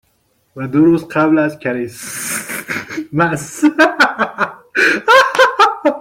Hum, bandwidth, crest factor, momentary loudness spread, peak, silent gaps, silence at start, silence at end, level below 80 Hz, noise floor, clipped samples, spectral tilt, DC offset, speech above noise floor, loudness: none; 16.5 kHz; 14 dB; 12 LU; 0 dBFS; none; 0.55 s; 0 s; -56 dBFS; -60 dBFS; under 0.1%; -4 dB/octave; under 0.1%; 47 dB; -14 LUFS